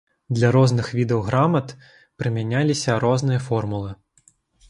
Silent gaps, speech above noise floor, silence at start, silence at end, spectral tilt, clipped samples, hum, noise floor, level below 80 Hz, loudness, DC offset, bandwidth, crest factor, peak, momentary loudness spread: none; 39 dB; 0.3 s; 0.75 s; -6.5 dB/octave; under 0.1%; none; -59 dBFS; -50 dBFS; -21 LUFS; under 0.1%; 11 kHz; 18 dB; -4 dBFS; 11 LU